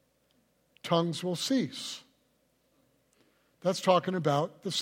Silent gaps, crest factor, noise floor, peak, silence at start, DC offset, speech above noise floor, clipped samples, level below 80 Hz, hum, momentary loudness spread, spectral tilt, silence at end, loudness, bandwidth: none; 22 dB; -72 dBFS; -10 dBFS; 0.85 s; under 0.1%; 42 dB; under 0.1%; -78 dBFS; none; 13 LU; -5 dB/octave; 0 s; -30 LUFS; 16.5 kHz